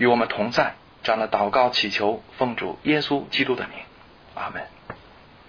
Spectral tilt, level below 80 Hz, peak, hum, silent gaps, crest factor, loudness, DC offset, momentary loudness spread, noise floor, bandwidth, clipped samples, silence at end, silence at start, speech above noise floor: -5 dB/octave; -58 dBFS; -6 dBFS; none; none; 18 dB; -23 LUFS; under 0.1%; 19 LU; -49 dBFS; 5.4 kHz; under 0.1%; 0.5 s; 0 s; 26 dB